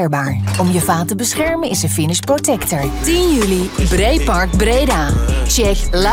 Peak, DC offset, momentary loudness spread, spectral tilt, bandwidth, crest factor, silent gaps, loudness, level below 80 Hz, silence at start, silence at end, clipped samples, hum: 0 dBFS; under 0.1%; 3 LU; -4.5 dB/octave; 17 kHz; 14 dB; none; -15 LUFS; -20 dBFS; 0 s; 0 s; under 0.1%; none